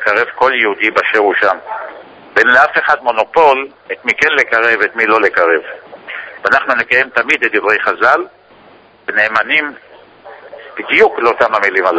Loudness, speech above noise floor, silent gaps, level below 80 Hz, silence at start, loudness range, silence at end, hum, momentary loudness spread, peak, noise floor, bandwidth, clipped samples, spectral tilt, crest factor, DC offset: -12 LUFS; 31 dB; none; -56 dBFS; 0 s; 4 LU; 0 s; none; 15 LU; 0 dBFS; -43 dBFS; 8 kHz; 0.6%; -3.5 dB/octave; 14 dB; under 0.1%